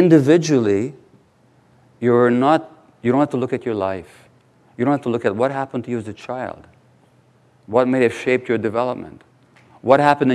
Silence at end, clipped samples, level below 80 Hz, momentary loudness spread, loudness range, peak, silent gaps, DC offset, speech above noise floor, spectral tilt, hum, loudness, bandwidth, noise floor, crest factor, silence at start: 0 s; under 0.1%; -66 dBFS; 14 LU; 5 LU; 0 dBFS; none; under 0.1%; 38 dB; -7 dB/octave; none; -19 LUFS; 12 kHz; -55 dBFS; 18 dB; 0 s